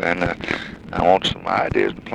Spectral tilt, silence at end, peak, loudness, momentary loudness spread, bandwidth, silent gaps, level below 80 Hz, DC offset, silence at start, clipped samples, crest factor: -5.5 dB/octave; 0 s; -2 dBFS; -20 LUFS; 9 LU; 11 kHz; none; -42 dBFS; under 0.1%; 0 s; under 0.1%; 18 dB